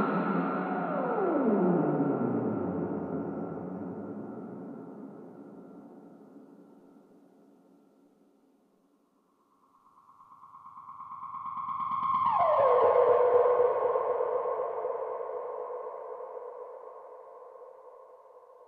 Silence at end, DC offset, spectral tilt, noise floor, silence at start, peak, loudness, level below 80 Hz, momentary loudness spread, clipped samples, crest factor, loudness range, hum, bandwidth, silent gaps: 0.05 s; under 0.1%; -10.5 dB/octave; -69 dBFS; 0 s; -12 dBFS; -29 LUFS; -76 dBFS; 25 LU; under 0.1%; 18 dB; 21 LU; none; 4.5 kHz; none